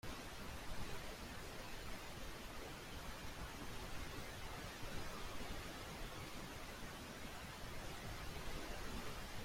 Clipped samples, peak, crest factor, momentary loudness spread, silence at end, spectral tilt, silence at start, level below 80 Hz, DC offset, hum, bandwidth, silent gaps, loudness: under 0.1%; -34 dBFS; 14 dB; 2 LU; 0 s; -3.5 dB/octave; 0.05 s; -54 dBFS; under 0.1%; none; 16.5 kHz; none; -50 LUFS